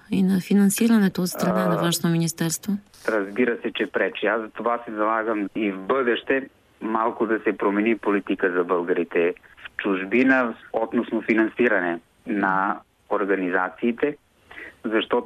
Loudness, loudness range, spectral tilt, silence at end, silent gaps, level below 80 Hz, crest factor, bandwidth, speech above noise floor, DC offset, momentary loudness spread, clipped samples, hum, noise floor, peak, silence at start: -23 LUFS; 2 LU; -5.5 dB/octave; 0 s; none; -64 dBFS; 16 dB; 14.5 kHz; 20 dB; under 0.1%; 9 LU; under 0.1%; none; -43 dBFS; -6 dBFS; 0.1 s